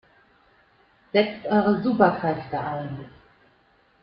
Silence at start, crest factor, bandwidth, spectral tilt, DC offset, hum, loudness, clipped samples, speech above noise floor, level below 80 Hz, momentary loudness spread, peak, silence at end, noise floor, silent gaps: 1.15 s; 22 dB; 5.4 kHz; -10 dB/octave; under 0.1%; none; -23 LUFS; under 0.1%; 38 dB; -60 dBFS; 12 LU; -4 dBFS; 0.95 s; -61 dBFS; none